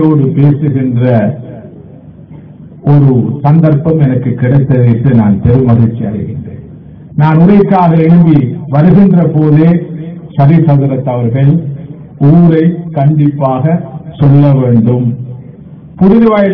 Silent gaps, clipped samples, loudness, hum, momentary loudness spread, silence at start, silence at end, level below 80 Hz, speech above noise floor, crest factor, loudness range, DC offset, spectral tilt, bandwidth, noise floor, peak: none; 4%; -8 LUFS; none; 15 LU; 0 s; 0 s; -36 dBFS; 25 dB; 8 dB; 4 LU; under 0.1%; -12.5 dB/octave; 3.9 kHz; -32 dBFS; 0 dBFS